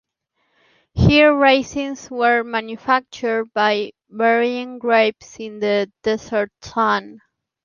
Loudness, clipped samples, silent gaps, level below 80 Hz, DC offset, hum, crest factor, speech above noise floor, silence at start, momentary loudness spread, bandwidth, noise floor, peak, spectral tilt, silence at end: -18 LUFS; under 0.1%; none; -40 dBFS; under 0.1%; none; 18 dB; 51 dB; 0.95 s; 13 LU; 7.2 kHz; -70 dBFS; -2 dBFS; -6 dB/octave; 0.5 s